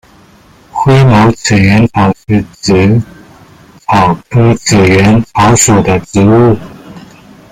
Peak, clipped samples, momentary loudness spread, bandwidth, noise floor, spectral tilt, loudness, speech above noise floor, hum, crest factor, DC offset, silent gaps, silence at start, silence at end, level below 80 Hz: 0 dBFS; under 0.1%; 8 LU; 15.5 kHz; -41 dBFS; -5.5 dB/octave; -8 LUFS; 34 dB; none; 8 dB; under 0.1%; none; 0.75 s; 0.5 s; -34 dBFS